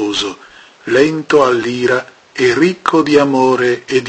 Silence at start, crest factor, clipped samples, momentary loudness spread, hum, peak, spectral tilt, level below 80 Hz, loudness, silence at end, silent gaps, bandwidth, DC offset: 0 s; 14 dB; under 0.1%; 8 LU; none; 0 dBFS; -5 dB/octave; -52 dBFS; -13 LUFS; 0 s; none; 8.8 kHz; under 0.1%